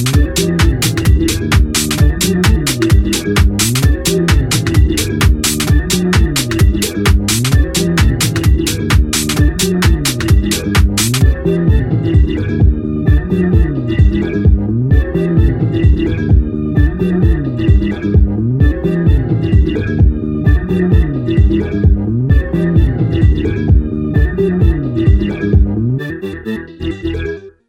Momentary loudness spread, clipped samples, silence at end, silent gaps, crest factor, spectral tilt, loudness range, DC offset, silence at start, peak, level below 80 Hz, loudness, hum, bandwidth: 3 LU; under 0.1%; 0.2 s; none; 12 dB; -5.5 dB/octave; 1 LU; under 0.1%; 0 s; 0 dBFS; -16 dBFS; -13 LUFS; none; 16.5 kHz